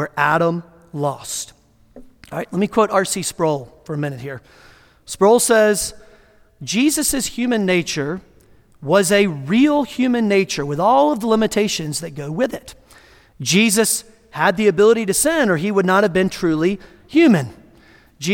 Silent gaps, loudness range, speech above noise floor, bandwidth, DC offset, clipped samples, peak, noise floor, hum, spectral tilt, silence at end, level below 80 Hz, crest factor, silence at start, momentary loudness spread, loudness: none; 6 LU; 33 dB; 18 kHz; under 0.1%; under 0.1%; 0 dBFS; -50 dBFS; none; -4 dB/octave; 0 s; -50 dBFS; 18 dB; 0 s; 15 LU; -17 LUFS